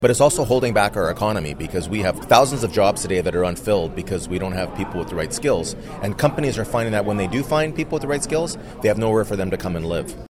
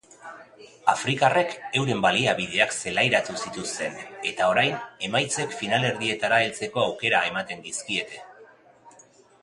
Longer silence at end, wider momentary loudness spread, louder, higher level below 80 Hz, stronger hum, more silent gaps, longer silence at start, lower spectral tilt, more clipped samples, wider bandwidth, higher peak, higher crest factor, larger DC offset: second, 0.05 s vs 0.55 s; about the same, 10 LU vs 10 LU; first, -21 LUFS vs -24 LUFS; first, -38 dBFS vs -62 dBFS; neither; neither; second, 0 s vs 0.2 s; first, -5 dB/octave vs -3 dB/octave; neither; first, 16.5 kHz vs 11.5 kHz; about the same, 0 dBFS vs -2 dBFS; about the same, 20 dB vs 24 dB; neither